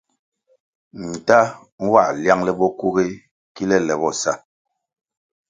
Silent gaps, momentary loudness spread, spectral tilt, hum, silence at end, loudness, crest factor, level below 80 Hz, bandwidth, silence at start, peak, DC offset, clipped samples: 1.72-1.78 s, 3.31-3.55 s; 13 LU; -5 dB/octave; none; 1.1 s; -19 LUFS; 20 dB; -58 dBFS; 9.6 kHz; 0.95 s; 0 dBFS; under 0.1%; under 0.1%